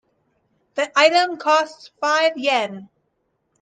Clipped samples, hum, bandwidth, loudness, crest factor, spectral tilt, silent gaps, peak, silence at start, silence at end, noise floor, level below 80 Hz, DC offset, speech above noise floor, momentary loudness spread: under 0.1%; none; 9.6 kHz; -19 LUFS; 20 dB; -2 dB/octave; none; -2 dBFS; 0.75 s; 0.75 s; -71 dBFS; -76 dBFS; under 0.1%; 52 dB; 15 LU